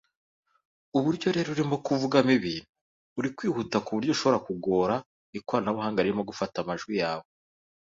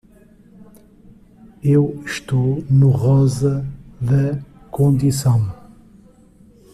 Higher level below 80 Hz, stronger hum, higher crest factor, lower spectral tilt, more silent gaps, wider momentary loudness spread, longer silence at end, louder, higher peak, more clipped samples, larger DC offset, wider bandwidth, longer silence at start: second, -64 dBFS vs -44 dBFS; neither; first, 22 dB vs 14 dB; second, -6 dB/octave vs -7.5 dB/octave; first, 2.69-2.74 s, 2.81-3.16 s, 5.06-5.33 s vs none; second, 9 LU vs 12 LU; second, 0.75 s vs 1.2 s; second, -28 LUFS vs -18 LUFS; about the same, -6 dBFS vs -4 dBFS; neither; neither; second, 7.8 kHz vs 14 kHz; second, 0.95 s vs 1.65 s